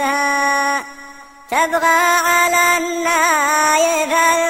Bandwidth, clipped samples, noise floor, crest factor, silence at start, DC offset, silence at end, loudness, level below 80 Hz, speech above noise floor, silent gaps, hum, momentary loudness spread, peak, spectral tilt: 16.5 kHz; under 0.1%; -38 dBFS; 14 dB; 0 s; under 0.1%; 0 s; -14 LUFS; -56 dBFS; 23 dB; none; none; 6 LU; -2 dBFS; 0 dB/octave